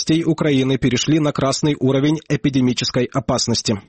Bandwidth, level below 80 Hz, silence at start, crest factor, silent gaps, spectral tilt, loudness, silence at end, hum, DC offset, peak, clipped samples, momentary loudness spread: 8.8 kHz; -44 dBFS; 0 s; 12 dB; none; -5 dB/octave; -18 LUFS; 0.05 s; none; under 0.1%; -6 dBFS; under 0.1%; 3 LU